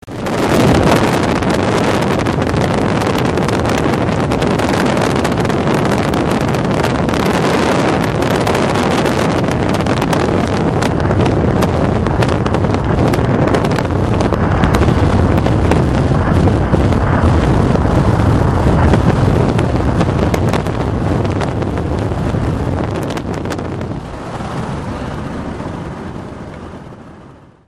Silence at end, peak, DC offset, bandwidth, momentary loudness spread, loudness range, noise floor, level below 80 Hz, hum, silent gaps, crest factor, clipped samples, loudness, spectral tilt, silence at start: 0.35 s; 0 dBFS; under 0.1%; 15 kHz; 10 LU; 7 LU; -39 dBFS; -24 dBFS; none; none; 14 dB; under 0.1%; -14 LUFS; -6.5 dB/octave; 0.05 s